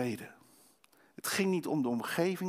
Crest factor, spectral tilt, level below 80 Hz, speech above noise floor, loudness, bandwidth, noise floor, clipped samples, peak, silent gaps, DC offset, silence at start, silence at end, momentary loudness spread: 16 dB; -5 dB/octave; -80 dBFS; 33 dB; -33 LUFS; 16 kHz; -66 dBFS; under 0.1%; -18 dBFS; none; under 0.1%; 0 s; 0 s; 11 LU